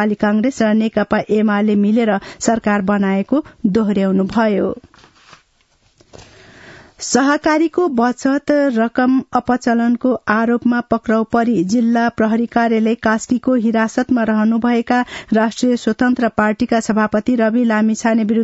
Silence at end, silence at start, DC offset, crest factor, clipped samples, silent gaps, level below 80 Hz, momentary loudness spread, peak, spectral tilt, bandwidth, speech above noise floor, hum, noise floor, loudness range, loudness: 0 s; 0 s; under 0.1%; 16 dB; under 0.1%; none; -50 dBFS; 3 LU; 0 dBFS; -5.5 dB/octave; 8 kHz; 42 dB; none; -58 dBFS; 4 LU; -16 LUFS